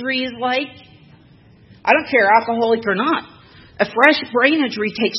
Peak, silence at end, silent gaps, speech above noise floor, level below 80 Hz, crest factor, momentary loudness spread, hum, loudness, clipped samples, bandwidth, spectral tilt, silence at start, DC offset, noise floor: 0 dBFS; 0 s; none; 31 dB; -60 dBFS; 18 dB; 9 LU; none; -17 LUFS; under 0.1%; 8.8 kHz; -5 dB/octave; 0 s; under 0.1%; -48 dBFS